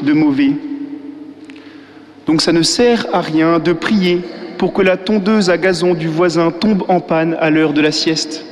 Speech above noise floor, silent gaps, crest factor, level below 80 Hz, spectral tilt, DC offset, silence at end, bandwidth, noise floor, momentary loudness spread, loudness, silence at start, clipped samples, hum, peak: 25 dB; none; 12 dB; -48 dBFS; -5 dB/octave; under 0.1%; 0 s; 12 kHz; -38 dBFS; 13 LU; -14 LUFS; 0 s; under 0.1%; none; -2 dBFS